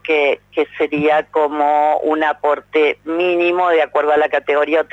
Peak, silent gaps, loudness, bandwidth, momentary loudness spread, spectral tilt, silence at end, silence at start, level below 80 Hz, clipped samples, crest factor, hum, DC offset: -6 dBFS; none; -16 LUFS; 7.8 kHz; 4 LU; -6 dB/octave; 0.1 s; 0.05 s; -60 dBFS; under 0.1%; 10 dB; 50 Hz at -55 dBFS; under 0.1%